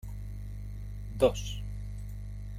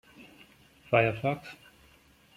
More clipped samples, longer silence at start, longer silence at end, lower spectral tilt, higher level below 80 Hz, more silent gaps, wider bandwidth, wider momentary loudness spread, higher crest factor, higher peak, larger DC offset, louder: neither; second, 0.05 s vs 0.2 s; second, 0 s vs 0.8 s; about the same, -6 dB/octave vs -7 dB/octave; first, -40 dBFS vs -64 dBFS; neither; about the same, 16 kHz vs 15.5 kHz; second, 14 LU vs 23 LU; about the same, 24 dB vs 24 dB; about the same, -10 dBFS vs -10 dBFS; neither; second, -35 LUFS vs -28 LUFS